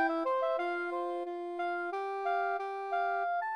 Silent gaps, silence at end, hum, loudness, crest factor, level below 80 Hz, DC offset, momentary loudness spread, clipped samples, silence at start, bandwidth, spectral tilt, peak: none; 0 s; none; -34 LUFS; 12 dB; -88 dBFS; under 0.1%; 5 LU; under 0.1%; 0 s; 9.6 kHz; -3 dB/octave; -20 dBFS